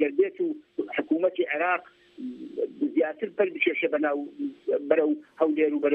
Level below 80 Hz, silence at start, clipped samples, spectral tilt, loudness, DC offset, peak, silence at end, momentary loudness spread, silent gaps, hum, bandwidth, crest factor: -80 dBFS; 0 s; under 0.1%; -7.5 dB/octave; -27 LUFS; under 0.1%; -8 dBFS; 0 s; 10 LU; none; none; 4 kHz; 20 dB